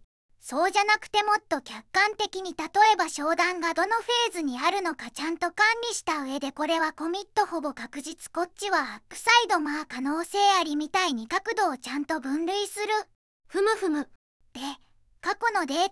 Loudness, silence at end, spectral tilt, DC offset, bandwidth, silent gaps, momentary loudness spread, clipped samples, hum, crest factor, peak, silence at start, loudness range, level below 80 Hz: -26 LUFS; 0 s; -1 dB/octave; under 0.1%; 12 kHz; 13.15-13.40 s, 14.15-14.40 s; 12 LU; under 0.1%; none; 20 dB; -6 dBFS; 0.45 s; 5 LU; -66 dBFS